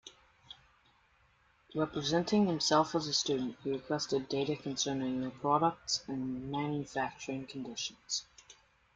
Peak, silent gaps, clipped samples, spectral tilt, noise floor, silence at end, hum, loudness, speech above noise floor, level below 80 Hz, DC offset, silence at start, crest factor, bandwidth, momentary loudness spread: -14 dBFS; none; under 0.1%; -4 dB/octave; -69 dBFS; 0.4 s; none; -34 LUFS; 35 dB; -68 dBFS; under 0.1%; 0.05 s; 22 dB; 9.4 kHz; 12 LU